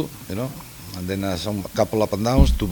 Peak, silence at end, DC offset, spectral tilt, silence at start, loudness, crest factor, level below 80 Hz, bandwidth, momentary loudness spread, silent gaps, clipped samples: 0 dBFS; 0 s; under 0.1%; -6 dB/octave; 0 s; -23 LUFS; 22 dB; -26 dBFS; 19 kHz; 14 LU; none; under 0.1%